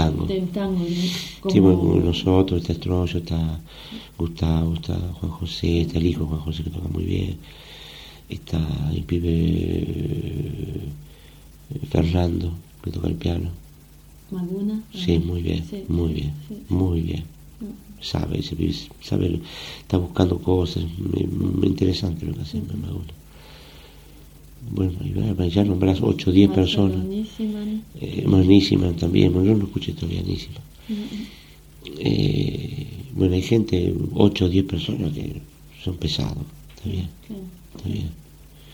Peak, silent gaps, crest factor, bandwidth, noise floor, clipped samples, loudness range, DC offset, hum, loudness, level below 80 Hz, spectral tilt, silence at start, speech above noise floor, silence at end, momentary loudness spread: -2 dBFS; none; 22 dB; 19.5 kHz; -47 dBFS; under 0.1%; 7 LU; under 0.1%; none; -23 LUFS; -38 dBFS; -7.5 dB/octave; 0 s; 25 dB; 0 s; 18 LU